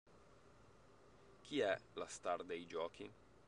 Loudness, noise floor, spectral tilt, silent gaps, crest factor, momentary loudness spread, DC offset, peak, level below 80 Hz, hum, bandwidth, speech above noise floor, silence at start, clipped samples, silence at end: -44 LUFS; -67 dBFS; -3.5 dB/octave; none; 24 dB; 17 LU; under 0.1%; -24 dBFS; -78 dBFS; none; 11 kHz; 23 dB; 0.1 s; under 0.1%; 0.25 s